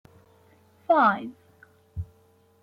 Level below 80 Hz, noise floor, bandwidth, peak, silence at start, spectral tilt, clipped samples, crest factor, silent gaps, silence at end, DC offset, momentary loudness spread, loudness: -56 dBFS; -61 dBFS; 6.4 kHz; -10 dBFS; 0.9 s; -8 dB/octave; under 0.1%; 20 dB; none; 0.6 s; under 0.1%; 22 LU; -22 LUFS